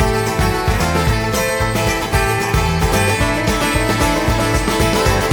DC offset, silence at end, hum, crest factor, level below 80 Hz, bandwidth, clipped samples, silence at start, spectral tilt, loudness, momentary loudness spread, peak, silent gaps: under 0.1%; 0 s; none; 16 dB; -24 dBFS; 19 kHz; under 0.1%; 0 s; -4.5 dB/octave; -16 LUFS; 2 LU; 0 dBFS; none